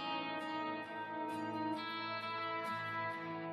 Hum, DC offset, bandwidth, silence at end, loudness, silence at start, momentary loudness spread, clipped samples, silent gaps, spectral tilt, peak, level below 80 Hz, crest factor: none; under 0.1%; 14.5 kHz; 0 s; -41 LUFS; 0 s; 3 LU; under 0.1%; none; -5.5 dB/octave; -28 dBFS; -90 dBFS; 12 dB